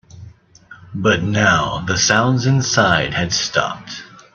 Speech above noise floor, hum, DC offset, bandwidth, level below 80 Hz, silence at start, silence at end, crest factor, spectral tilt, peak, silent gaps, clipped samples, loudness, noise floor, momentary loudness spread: 28 dB; none; under 0.1%; 7.4 kHz; -46 dBFS; 0.15 s; 0.3 s; 18 dB; -4 dB/octave; 0 dBFS; none; under 0.1%; -16 LUFS; -44 dBFS; 14 LU